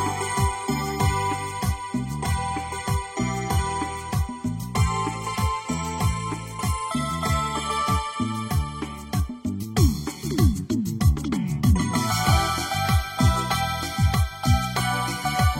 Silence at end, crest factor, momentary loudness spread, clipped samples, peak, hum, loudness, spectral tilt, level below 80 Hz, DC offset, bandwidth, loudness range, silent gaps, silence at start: 0 s; 16 dB; 7 LU; under 0.1%; -6 dBFS; none; -25 LUFS; -5 dB/octave; -32 dBFS; under 0.1%; 16.5 kHz; 4 LU; none; 0 s